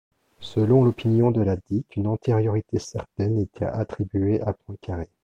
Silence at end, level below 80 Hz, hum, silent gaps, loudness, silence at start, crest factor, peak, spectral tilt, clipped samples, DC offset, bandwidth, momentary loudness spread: 0.2 s; -48 dBFS; none; none; -24 LUFS; 0.4 s; 16 dB; -8 dBFS; -8.5 dB/octave; under 0.1%; under 0.1%; 7.8 kHz; 14 LU